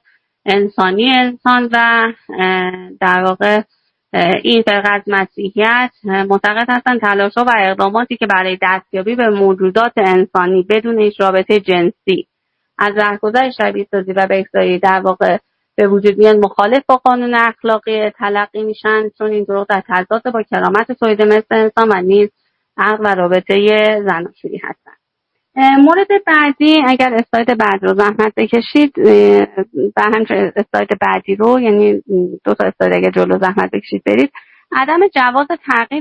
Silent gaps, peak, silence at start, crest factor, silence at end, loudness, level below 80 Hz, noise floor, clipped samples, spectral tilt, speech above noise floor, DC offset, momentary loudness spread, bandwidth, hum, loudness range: none; 0 dBFS; 0.45 s; 12 dB; 0 s; -13 LUFS; -58 dBFS; -72 dBFS; 0.3%; -6.5 dB/octave; 60 dB; under 0.1%; 7 LU; 8 kHz; none; 3 LU